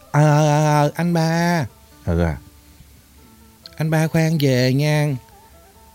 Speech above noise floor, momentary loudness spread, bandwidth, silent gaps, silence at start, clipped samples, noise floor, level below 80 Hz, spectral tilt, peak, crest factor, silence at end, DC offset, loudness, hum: 30 dB; 11 LU; 16.5 kHz; none; 0.15 s; under 0.1%; -48 dBFS; -42 dBFS; -6.5 dB/octave; -4 dBFS; 14 dB; 0.75 s; under 0.1%; -18 LUFS; none